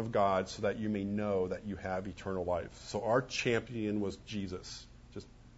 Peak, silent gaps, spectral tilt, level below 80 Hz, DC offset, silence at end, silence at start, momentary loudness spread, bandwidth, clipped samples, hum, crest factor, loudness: -16 dBFS; none; -5 dB/octave; -58 dBFS; under 0.1%; 0 s; 0 s; 15 LU; 7.6 kHz; under 0.1%; 60 Hz at -60 dBFS; 20 dB; -35 LUFS